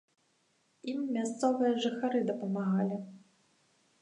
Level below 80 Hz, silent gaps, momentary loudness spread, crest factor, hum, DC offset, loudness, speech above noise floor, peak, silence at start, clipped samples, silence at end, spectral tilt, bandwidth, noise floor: -86 dBFS; none; 11 LU; 18 dB; none; under 0.1%; -32 LUFS; 42 dB; -16 dBFS; 0.85 s; under 0.1%; 0.8 s; -6 dB/octave; 10.5 kHz; -73 dBFS